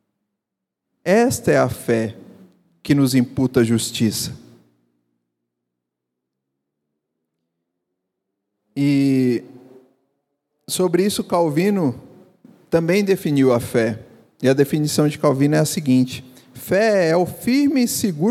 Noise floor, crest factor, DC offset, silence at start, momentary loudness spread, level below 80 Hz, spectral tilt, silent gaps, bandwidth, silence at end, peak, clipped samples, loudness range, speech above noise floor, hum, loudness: -82 dBFS; 18 dB; under 0.1%; 1.05 s; 9 LU; -58 dBFS; -5.5 dB/octave; none; 16 kHz; 0 s; -2 dBFS; under 0.1%; 6 LU; 65 dB; none; -19 LUFS